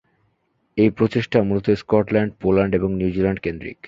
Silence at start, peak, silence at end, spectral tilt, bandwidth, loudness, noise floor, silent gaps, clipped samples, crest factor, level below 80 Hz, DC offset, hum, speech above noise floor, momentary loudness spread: 0.75 s; 0 dBFS; 0.15 s; -8.5 dB/octave; 7.4 kHz; -20 LUFS; -67 dBFS; none; under 0.1%; 20 dB; -44 dBFS; under 0.1%; none; 48 dB; 4 LU